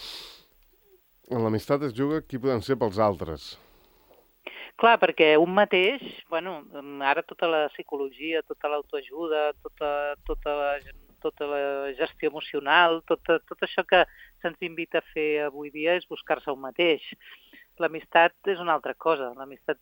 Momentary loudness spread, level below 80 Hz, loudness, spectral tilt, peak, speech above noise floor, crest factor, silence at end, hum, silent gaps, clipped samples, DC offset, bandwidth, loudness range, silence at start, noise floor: 15 LU; -54 dBFS; -26 LUFS; -6 dB/octave; -6 dBFS; 35 dB; 22 dB; 0.1 s; none; none; under 0.1%; under 0.1%; 17 kHz; 6 LU; 0 s; -61 dBFS